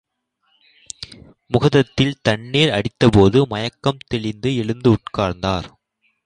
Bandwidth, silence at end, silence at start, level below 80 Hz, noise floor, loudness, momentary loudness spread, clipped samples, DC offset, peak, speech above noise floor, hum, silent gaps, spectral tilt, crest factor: 10.5 kHz; 0.6 s; 1 s; -42 dBFS; -67 dBFS; -18 LUFS; 19 LU; under 0.1%; under 0.1%; 0 dBFS; 50 dB; none; none; -6.5 dB/octave; 18 dB